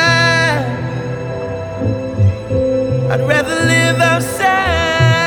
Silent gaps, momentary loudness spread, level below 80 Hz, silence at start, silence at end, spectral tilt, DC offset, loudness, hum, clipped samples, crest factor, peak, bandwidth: none; 11 LU; -36 dBFS; 0 s; 0 s; -5 dB/octave; under 0.1%; -14 LUFS; none; under 0.1%; 14 dB; 0 dBFS; 19.5 kHz